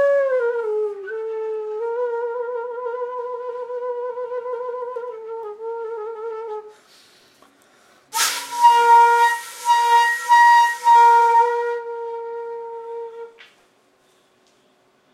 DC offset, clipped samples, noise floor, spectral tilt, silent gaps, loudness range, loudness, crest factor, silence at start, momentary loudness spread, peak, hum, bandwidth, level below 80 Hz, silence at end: under 0.1%; under 0.1%; -59 dBFS; 1.5 dB/octave; none; 17 LU; -18 LUFS; 16 dB; 0 s; 19 LU; -4 dBFS; none; 16 kHz; -86 dBFS; 1.85 s